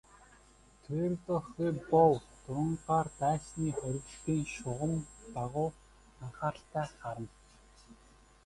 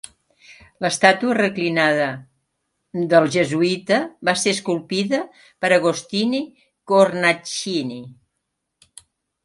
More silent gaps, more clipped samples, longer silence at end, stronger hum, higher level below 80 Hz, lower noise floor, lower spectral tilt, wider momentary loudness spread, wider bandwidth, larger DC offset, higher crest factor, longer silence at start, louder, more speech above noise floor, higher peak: neither; neither; second, 0.55 s vs 1.3 s; neither; first, -60 dBFS vs -66 dBFS; second, -61 dBFS vs -77 dBFS; first, -7 dB/octave vs -4 dB/octave; first, 14 LU vs 11 LU; about the same, 11.5 kHz vs 11.5 kHz; neither; about the same, 22 dB vs 20 dB; first, 0.9 s vs 0.5 s; second, -34 LUFS vs -19 LUFS; second, 28 dB vs 58 dB; second, -12 dBFS vs 0 dBFS